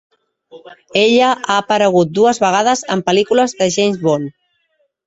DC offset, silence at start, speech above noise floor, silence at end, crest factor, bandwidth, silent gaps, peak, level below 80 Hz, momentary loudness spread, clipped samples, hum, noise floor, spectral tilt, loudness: under 0.1%; 0.55 s; 50 dB; 0.75 s; 14 dB; 8.2 kHz; none; 0 dBFS; -58 dBFS; 5 LU; under 0.1%; none; -64 dBFS; -4 dB/octave; -14 LUFS